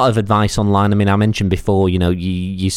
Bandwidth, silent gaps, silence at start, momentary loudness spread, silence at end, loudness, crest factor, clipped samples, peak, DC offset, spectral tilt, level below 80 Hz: 13 kHz; none; 0 s; 5 LU; 0 s; -16 LUFS; 14 dB; under 0.1%; -2 dBFS; under 0.1%; -6.5 dB/octave; -34 dBFS